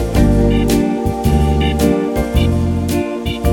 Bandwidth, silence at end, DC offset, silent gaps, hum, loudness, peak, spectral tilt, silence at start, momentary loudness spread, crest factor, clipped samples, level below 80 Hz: 18 kHz; 0 s; under 0.1%; none; none; -15 LUFS; 0 dBFS; -6.5 dB/octave; 0 s; 5 LU; 14 dB; under 0.1%; -20 dBFS